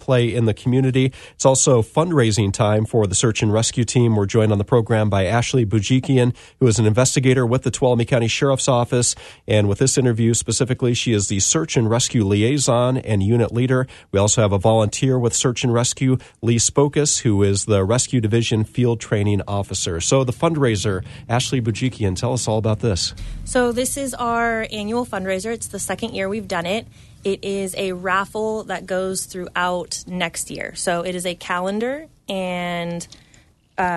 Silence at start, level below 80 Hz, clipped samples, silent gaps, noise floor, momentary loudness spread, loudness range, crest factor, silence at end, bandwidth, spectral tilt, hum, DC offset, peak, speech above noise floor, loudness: 0 s; -44 dBFS; under 0.1%; none; -53 dBFS; 8 LU; 6 LU; 18 dB; 0 s; 12.5 kHz; -5 dB/octave; none; under 0.1%; -2 dBFS; 34 dB; -19 LUFS